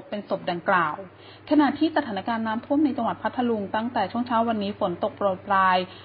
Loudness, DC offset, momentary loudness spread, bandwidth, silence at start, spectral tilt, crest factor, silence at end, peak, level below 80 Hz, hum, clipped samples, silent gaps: -25 LUFS; under 0.1%; 7 LU; 5.2 kHz; 0 s; -10 dB/octave; 16 dB; 0 s; -8 dBFS; -60 dBFS; none; under 0.1%; none